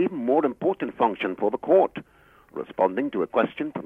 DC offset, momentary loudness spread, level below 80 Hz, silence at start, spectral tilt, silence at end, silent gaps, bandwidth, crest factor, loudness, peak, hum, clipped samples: under 0.1%; 13 LU; -66 dBFS; 0 s; -8 dB/octave; 0 s; none; 4.1 kHz; 16 dB; -24 LUFS; -8 dBFS; none; under 0.1%